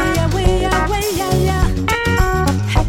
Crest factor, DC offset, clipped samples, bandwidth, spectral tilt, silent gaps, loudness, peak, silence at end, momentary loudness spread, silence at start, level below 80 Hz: 12 dB; under 0.1%; under 0.1%; 17 kHz; -5.5 dB/octave; none; -16 LUFS; -4 dBFS; 0 s; 2 LU; 0 s; -20 dBFS